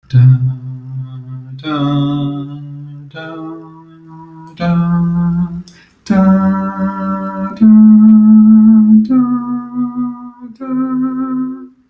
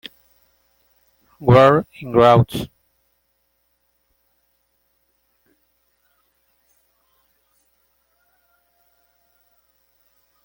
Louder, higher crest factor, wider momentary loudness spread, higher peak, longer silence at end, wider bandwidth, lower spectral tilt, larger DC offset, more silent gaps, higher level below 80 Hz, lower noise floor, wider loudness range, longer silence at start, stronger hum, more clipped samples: first, -11 LUFS vs -15 LUFS; second, 12 dB vs 22 dB; first, 23 LU vs 20 LU; about the same, 0 dBFS vs -2 dBFS; second, 0.2 s vs 7.8 s; second, 5.2 kHz vs 17 kHz; first, -10 dB/octave vs -7.5 dB/octave; neither; neither; first, -44 dBFS vs -52 dBFS; second, -36 dBFS vs -68 dBFS; first, 12 LU vs 6 LU; second, 0.1 s vs 1.4 s; neither; neither